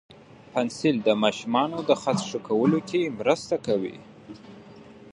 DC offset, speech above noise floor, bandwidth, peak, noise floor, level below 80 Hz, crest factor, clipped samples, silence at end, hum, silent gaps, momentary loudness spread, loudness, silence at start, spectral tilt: under 0.1%; 23 dB; 11 kHz; -6 dBFS; -47 dBFS; -66 dBFS; 20 dB; under 0.1%; 0 s; none; none; 21 LU; -25 LUFS; 0.55 s; -5.5 dB/octave